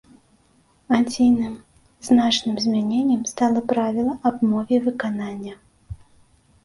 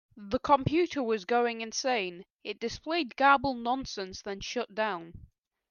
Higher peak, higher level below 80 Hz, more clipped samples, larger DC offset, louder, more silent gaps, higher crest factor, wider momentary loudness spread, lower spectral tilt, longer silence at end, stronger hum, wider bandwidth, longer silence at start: first, -4 dBFS vs -10 dBFS; first, -52 dBFS vs -58 dBFS; neither; neither; first, -21 LUFS vs -30 LUFS; second, none vs 2.30-2.39 s; about the same, 18 dB vs 22 dB; first, 20 LU vs 14 LU; about the same, -4.5 dB/octave vs -4 dB/octave; first, 0.7 s vs 0.45 s; neither; first, 11.5 kHz vs 7.2 kHz; first, 0.9 s vs 0.15 s